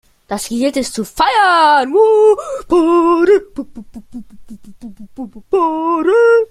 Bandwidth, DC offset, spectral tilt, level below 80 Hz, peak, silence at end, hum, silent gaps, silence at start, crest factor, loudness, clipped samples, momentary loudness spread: 14.5 kHz; under 0.1%; -3.5 dB/octave; -46 dBFS; -2 dBFS; 0.05 s; none; none; 0.3 s; 12 dB; -12 LUFS; under 0.1%; 21 LU